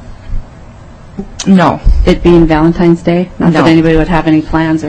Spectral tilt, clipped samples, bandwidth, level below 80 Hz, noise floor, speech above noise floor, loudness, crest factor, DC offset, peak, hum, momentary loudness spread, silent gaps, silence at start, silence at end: -7 dB/octave; 4%; 8.8 kHz; -18 dBFS; -31 dBFS; 24 dB; -9 LUFS; 10 dB; under 0.1%; 0 dBFS; none; 20 LU; none; 0 s; 0 s